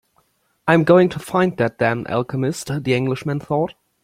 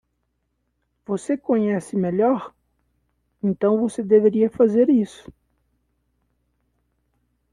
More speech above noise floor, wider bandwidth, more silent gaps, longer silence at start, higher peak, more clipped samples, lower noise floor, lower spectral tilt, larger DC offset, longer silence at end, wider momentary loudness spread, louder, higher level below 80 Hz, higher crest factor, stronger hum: second, 45 dB vs 54 dB; first, 15.5 kHz vs 11 kHz; neither; second, 0.65 s vs 1.1 s; first, 0 dBFS vs -4 dBFS; neither; second, -63 dBFS vs -73 dBFS; second, -6.5 dB/octave vs -8 dB/octave; neither; second, 0.35 s vs 2.45 s; about the same, 10 LU vs 11 LU; about the same, -19 LUFS vs -20 LUFS; first, -54 dBFS vs -62 dBFS; about the same, 18 dB vs 18 dB; neither